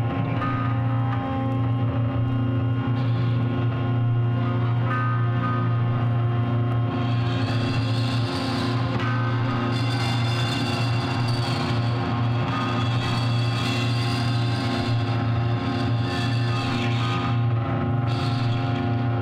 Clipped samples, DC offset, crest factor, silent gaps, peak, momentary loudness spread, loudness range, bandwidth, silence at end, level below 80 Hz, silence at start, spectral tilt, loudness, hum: under 0.1%; under 0.1%; 12 dB; none; -12 dBFS; 1 LU; 1 LU; 9.8 kHz; 0 s; -48 dBFS; 0 s; -7 dB/octave; -24 LUFS; none